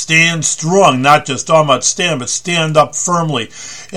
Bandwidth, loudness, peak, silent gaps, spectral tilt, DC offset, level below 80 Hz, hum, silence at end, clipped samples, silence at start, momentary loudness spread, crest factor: 15 kHz; -12 LUFS; 0 dBFS; none; -3 dB/octave; 1%; -52 dBFS; none; 0 s; 0.5%; 0 s; 8 LU; 14 dB